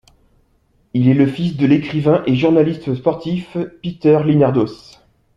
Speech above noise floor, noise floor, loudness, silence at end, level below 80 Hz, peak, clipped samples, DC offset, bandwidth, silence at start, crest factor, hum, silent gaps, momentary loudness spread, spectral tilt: 43 dB; -59 dBFS; -16 LUFS; 0.6 s; -52 dBFS; -2 dBFS; under 0.1%; under 0.1%; 7.4 kHz; 0.95 s; 14 dB; none; none; 10 LU; -9 dB/octave